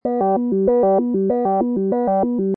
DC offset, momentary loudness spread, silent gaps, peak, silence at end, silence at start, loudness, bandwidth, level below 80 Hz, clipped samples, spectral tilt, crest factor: under 0.1%; 3 LU; none; -6 dBFS; 0 s; 0.05 s; -18 LUFS; 2.6 kHz; -52 dBFS; under 0.1%; -13 dB/octave; 12 dB